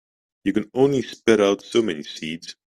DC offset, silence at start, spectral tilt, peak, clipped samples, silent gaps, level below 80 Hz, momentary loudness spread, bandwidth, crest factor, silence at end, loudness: under 0.1%; 0.45 s; -5 dB/octave; -2 dBFS; under 0.1%; none; -60 dBFS; 13 LU; 13 kHz; 20 dB; 0.25 s; -22 LUFS